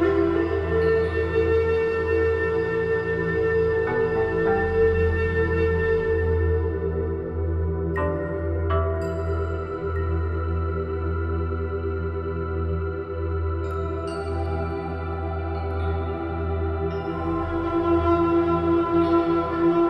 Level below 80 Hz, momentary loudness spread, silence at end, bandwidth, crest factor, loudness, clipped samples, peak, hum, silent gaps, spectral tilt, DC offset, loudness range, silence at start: -38 dBFS; 8 LU; 0 s; 5.6 kHz; 14 dB; -24 LUFS; under 0.1%; -8 dBFS; none; none; -9.5 dB/octave; under 0.1%; 6 LU; 0 s